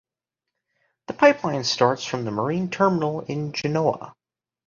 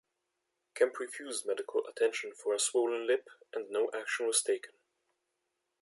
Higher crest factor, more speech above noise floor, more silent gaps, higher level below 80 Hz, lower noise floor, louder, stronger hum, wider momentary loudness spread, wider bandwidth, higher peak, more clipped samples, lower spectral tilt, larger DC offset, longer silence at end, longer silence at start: about the same, 22 dB vs 20 dB; first, 64 dB vs 51 dB; neither; first, -62 dBFS vs under -90 dBFS; about the same, -86 dBFS vs -84 dBFS; first, -22 LUFS vs -33 LUFS; neither; about the same, 10 LU vs 10 LU; second, 7.4 kHz vs 11.5 kHz; first, -2 dBFS vs -14 dBFS; neither; first, -5 dB/octave vs 0.5 dB/octave; neither; second, 0.55 s vs 1.15 s; first, 1.1 s vs 0.75 s